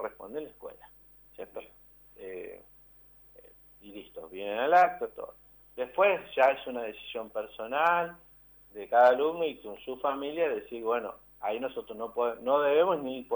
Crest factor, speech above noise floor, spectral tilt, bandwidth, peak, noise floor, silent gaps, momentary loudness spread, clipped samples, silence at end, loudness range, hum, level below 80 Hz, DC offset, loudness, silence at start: 18 dB; 28 dB; -5.5 dB/octave; over 20 kHz; -12 dBFS; -57 dBFS; none; 22 LU; under 0.1%; 0 s; 17 LU; 50 Hz at -65 dBFS; -66 dBFS; under 0.1%; -29 LUFS; 0 s